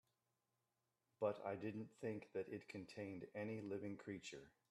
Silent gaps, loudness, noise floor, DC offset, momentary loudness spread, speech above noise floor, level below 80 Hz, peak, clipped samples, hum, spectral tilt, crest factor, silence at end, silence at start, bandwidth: none; -50 LUFS; -90 dBFS; under 0.1%; 8 LU; 41 dB; -86 dBFS; -28 dBFS; under 0.1%; none; -6.5 dB/octave; 22 dB; 0.2 s; 1.2 s; 13 kHz